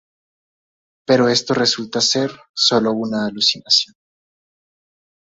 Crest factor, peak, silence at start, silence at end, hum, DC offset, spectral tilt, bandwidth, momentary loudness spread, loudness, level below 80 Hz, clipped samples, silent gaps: 18 dB; -2 dBFS; 1.1 s; 1.4 s; none; under 0.1%; -3 dB/octave; 8 kHz; 8 LU; -17 LUFS; -62 dBFS; under 0.1%; 2.49-2.54 s